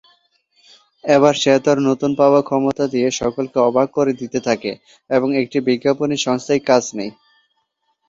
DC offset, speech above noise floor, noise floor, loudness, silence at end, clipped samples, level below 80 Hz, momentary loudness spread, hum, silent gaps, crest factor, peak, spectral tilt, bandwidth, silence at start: under 0.1%; 52 dB; -69 dBFS; -17 LUFS; 1 s; under 0.1%; -56 dBFS; 8 LU; none; none; 16 dB; -2 dBFS; -5 dB/octave; 7.8 kHz; 1.05 s